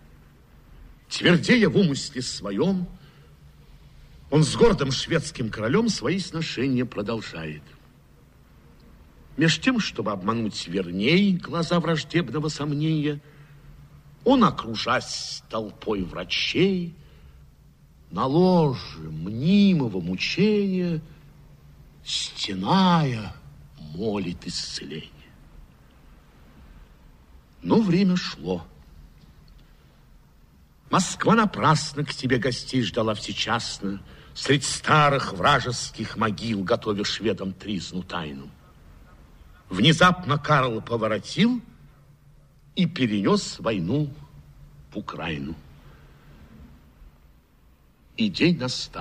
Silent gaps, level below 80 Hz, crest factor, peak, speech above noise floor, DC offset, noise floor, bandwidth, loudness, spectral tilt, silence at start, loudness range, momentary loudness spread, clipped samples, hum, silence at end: none; -50 dBFS; 20 dB; -4 dBFS; 33 dB; under 0.1%; -57 dBFS; 11 kHz; -24 LUFS; -5 dB/octave; 0.7 s; 8 LU; 14 LU; under 0.1%; none; 0 s